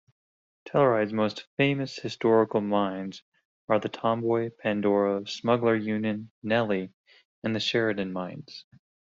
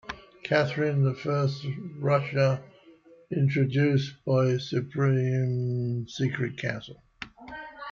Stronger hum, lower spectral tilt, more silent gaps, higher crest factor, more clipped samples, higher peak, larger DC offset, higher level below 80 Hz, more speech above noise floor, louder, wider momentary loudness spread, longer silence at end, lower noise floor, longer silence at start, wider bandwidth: neither; second, -4.5 dB/octave vs -7.5 dB/octave; first, 1.47-1.57 s, 3.22-3.32 s, 3.45-3.68 s, 6.30-6.42 s, 6.94-7.04 s, 7.25-7.42 s vs none; about the same, 18 dB vs 16 dB; neither; about the same, -8 dBFS vs -10 dBFS; neither; second, -68 dBFS vs -62 dBFS; first, over 64 dB vs 29 dB; about the same, -27 LUFS vs -27 LUFS; second, 13 LU vs 16 LU; first, 0.6 s vs 0 s; first, under -90 dBFS vs -55 dBFS; first, 0.65 s vs 0.05 s; about the same, 7.8 kHz vs 7.2 kHz